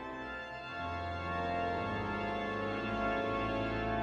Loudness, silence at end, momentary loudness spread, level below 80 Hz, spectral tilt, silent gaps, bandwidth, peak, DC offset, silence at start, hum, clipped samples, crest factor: -36 LUFS; 0 s; 8 LU; -52 dBFS; -7 dB/octave; none; 9.4 kHz; -22 dBFS; under 0.1%; 0 s; none; under 0.1%; 14 dB